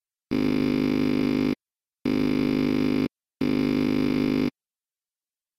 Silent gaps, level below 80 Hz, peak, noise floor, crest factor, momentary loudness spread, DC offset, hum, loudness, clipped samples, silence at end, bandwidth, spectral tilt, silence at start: none; -54 dBFS; -12 dBFS; under -90 dBFS; 14 dB; 7 LU; under 0.1%; none; -25 LUFS; under 0.1%; 1.1 s; 14.5 kHz; -7 dB/octave; 0.3 s